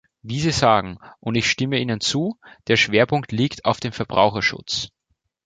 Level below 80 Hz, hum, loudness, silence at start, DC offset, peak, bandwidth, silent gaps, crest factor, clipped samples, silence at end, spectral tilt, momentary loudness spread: -50 dBFS; none; -20 LUFS; 0.25 s; under 0.1%; -2 dBFS; 9.4 kHz; none; 20 dB; under 0.1%; 0.6 s; -4.5 dB/octave; 11 LU